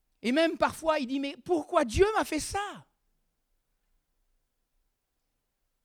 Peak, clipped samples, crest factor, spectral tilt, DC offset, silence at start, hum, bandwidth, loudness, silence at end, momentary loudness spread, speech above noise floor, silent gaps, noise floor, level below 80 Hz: -10 dBFS; under 0.1%; 22 dB; -4.5 dB/octave; under 0.1%; 0.25 s; none; 17 kHz; -28 LUFS; 3.05 s; 8 LU; 52 dB; none; -80 dBFS; -50 dBFS